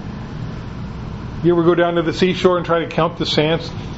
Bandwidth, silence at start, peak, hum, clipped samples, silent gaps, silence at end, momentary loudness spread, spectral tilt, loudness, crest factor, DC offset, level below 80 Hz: 8 kHz; 0 s; 0 dBFS; none; under 0.1%; none; 0 s; 15 LU; -6.5 dB/octave; -17 LUFS; 18 dB; under 0.1%; -38 dBFS